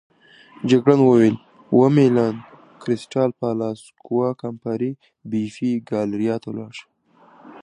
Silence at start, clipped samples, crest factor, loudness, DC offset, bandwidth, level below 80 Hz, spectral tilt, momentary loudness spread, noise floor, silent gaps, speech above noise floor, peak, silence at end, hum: 0.6 s; under 0.1%; 18 dB; -20 LUFS; under 0.1%; 10.5 kHz; -64 dBFS; -8 dB/octave; 18 LU; -52 dBFS; none; 33 dB; -2 dBFS; 0.05 s; none